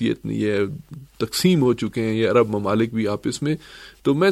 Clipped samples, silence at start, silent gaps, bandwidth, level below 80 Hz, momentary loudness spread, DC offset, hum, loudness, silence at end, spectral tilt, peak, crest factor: under 0.1%; 0 s; none; 15 kHz; -54 dBFS; 11 LU; under 0.1%; none; -22 LUFS; 0 s; -6 dB/octave; -4 dBFS; 16 dB